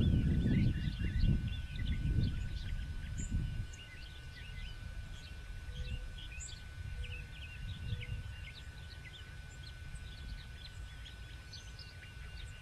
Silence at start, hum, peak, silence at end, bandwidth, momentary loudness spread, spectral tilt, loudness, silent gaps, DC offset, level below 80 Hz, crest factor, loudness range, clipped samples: 0 s; none; -20 dBFS; 0 s; 13 kHz; 15 LU; -6 dB/octave; -41 LUFS; none; under 0.1%; -42 dBFS; 18 dB; 12 LU; under 0.1%